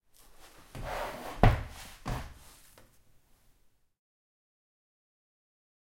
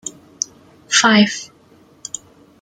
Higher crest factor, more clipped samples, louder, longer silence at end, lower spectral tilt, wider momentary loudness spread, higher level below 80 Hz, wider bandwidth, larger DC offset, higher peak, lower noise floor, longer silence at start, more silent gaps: first, 32 dB vs 20 dB; neither; second, -33 LUFS vs -15 LUFS; first, 3.55 s vs 1.15 s; first, -6.5 dB/octave vs -2.5 dB/octave; first, 26 LU vs 21 LU; first, -40 dBFS vs -62 dBFS; first, 16.5 kHz vs 9.6 kHz; neither; second, -4 dBFS vs 0 dBFS; first, -66 dBFS vs -50 dBFS; first, 0.4 s vs 0.05 s; neither